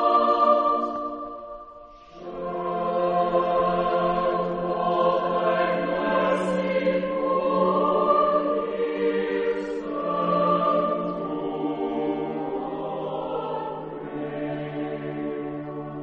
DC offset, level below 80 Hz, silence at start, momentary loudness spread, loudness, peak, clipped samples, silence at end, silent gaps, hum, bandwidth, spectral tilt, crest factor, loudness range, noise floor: under 0.1%; -54 dBFS; 0 s; 12 LU; -25 LUFS; -8 dBFS; under 0.1%; 0 s; none; none; 8.4 kHz; -7.5 dB/octave; 18 dB; 7 LU; -45 dBFS